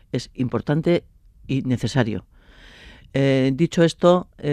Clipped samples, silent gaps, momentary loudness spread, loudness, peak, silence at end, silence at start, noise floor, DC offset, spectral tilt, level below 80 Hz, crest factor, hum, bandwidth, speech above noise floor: under 0.1%; none; 9 LU; -21 LUFS; -2 dBFS; 0 s; 0.15 s; -47 dBFS; under 0.1%; -7 dB/octave; -48 dBFS; 18 dB; none; 10.5 kHz; 27 dB